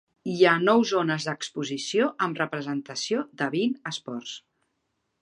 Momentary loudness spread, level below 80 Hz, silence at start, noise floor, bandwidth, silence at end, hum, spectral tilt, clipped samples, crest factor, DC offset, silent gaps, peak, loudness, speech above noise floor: 13 LU; -76 dBFS; 0.25 s; -77 dBFS; 11 kHz; 0.85 s; none; -4.5 dB/octave; under 0.1%; 22 dB; under 0.1%; none; -6 dBFS; -26 LUFS; 51 dB